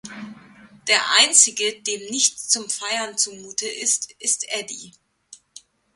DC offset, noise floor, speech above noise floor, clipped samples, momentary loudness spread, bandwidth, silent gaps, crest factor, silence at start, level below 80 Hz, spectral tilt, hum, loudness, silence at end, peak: under 0.1%; -50 dBFS; 28 dB; under 0.1%; 19 LU; 14 kHz; none; 24 dB; 0.05 s; -72 dBFS; 1.5 dB/octave; none; -19 LUFS; 0.6 s; 0 dBFS